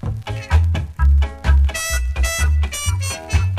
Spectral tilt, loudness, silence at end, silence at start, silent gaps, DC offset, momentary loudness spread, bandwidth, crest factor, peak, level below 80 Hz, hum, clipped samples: -4 dB/octave; -19 LUFS; 0 s; 0.05 s; none; under 0.1%; 5 LU; 14.5 kHz; 14 dB; -4 dBFS; -18 dBFS; none; under 0.1%